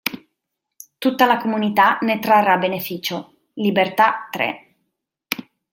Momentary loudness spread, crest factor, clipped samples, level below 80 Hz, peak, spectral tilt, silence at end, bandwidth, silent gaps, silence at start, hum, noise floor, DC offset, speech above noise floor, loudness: 12 LU; 18 dB; under 0.1%; -68 dBFS; -2 dBFS; -4.5 dB/octave; 0.3 s; 17 kHz; none; 0.05 s; none; -79 dBFS; under 0.1%; 61 dB; -19 LUFS